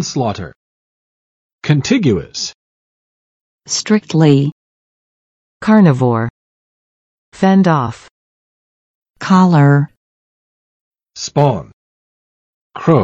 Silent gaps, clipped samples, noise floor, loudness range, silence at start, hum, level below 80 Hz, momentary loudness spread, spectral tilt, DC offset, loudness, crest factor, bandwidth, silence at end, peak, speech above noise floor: 0.56-1.59 s, 2.54-3.59 s, 4.52-5.60 s, 6.30-7.32 s, 8.11-9.14 s, 9.97-10.92 s, 11.73-12.70 s; under 0.1%; under -90 dBFS; 5 LU; 0 s; none; -52 dBFS; 15 LU; -6.5 dB/octave; under 0.1%; -14 LUFS; 16 dB; 8.4 kHz; 0 s; 0 dBFS; over 78 dB